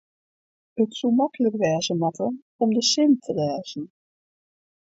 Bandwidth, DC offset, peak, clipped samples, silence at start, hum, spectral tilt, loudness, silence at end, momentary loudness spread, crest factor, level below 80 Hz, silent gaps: 8 kHz; under 0.1%; -8 dBFS; under 0.1%; 0.75 s; none; -4.5 dB/octave; -23 LUFS; 1 s; 14 LU; 16 dB; -70 dBFS; 2.42-2.59 s